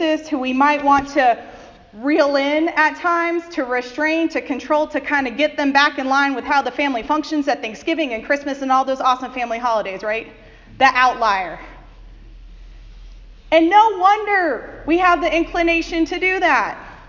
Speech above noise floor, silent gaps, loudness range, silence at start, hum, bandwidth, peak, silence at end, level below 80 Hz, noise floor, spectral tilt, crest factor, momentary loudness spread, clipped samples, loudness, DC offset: 22 dB; none; 4 LU; 0 s; none; 7.6 kHz; 0 dBFS; 0 s; -44 dBFS; -40 dBFS; -3.5 dB/octave; 18 dB; 8 LU; under 0.1%; -18 LUFS; under 0.1%